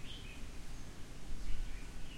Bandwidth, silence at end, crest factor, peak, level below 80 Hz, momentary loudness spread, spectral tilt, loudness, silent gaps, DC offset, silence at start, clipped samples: 12 kHz; 0 s; 16 dB; -22 dBFS; -44 dBFS; 5 LU; -4 dB/octave; -50 LUFS; none; under 0.1%; 0 s; under 0.1%